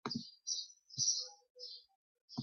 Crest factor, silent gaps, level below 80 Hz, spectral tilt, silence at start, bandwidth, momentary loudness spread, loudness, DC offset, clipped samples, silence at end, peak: 22 dB; 1.50-1.55 s, 1.95-2.15 s, 2.21-2.28 s; -82 dBFS; -1.5 dB/octave; 0.05 s; 9.6 kHz; 16 LU; -38 LUFS; under 0.1%; under 0.1%; 0 s; -22 dBFS